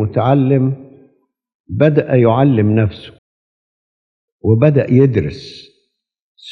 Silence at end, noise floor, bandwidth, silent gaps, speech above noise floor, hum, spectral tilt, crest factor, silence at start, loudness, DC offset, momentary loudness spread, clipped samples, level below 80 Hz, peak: 0 s; -66 dBFS; 6.2 kHz; 1.54-1.64 s, 3.18-4.39 s, 6.22-6.35 s; 53 dB; none; -10 dB/octave; 16 dB; 0 s; -13 LUFS; under 0.1%; 16 LU; under 0.1%; -50 dBFS; 0 dBFS